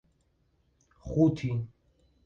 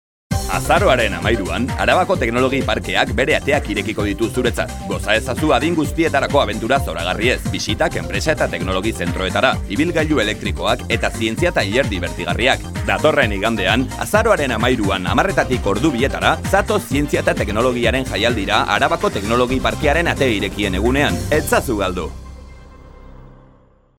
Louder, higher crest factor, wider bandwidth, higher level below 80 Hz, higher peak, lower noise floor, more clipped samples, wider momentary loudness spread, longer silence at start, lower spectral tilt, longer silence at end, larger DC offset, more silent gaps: second, -29 LUFS vs -17 LUFS; about the same, 20 dB vs 18 dB; second, 7.4 kHz vs 17.5 kHz; second, -54 dBFS vs -30 dBFS; second, -12 dBFS vs 0 dBFS; first, -71 dBFS vs -51 dBFS; neither; first, 19 LU vs 5 LU; first, 1.05 s vs 0.3 s; first, -9 dB/octave vs -5 dB/octave; about the same, 0.6 s vs 0.65 s; neither; neither